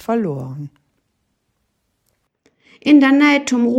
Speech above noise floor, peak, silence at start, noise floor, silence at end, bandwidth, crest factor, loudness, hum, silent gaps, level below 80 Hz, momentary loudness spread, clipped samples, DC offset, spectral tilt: 55 dB; -2 dBFS; 0.1 s; -69 dBFS; 0 s; 8.4 kHz; 16 dB; -14 LUFS; none; none; -68 dBFS; 21 LU; under 0.1%; under 0.1%; -5 dB/octave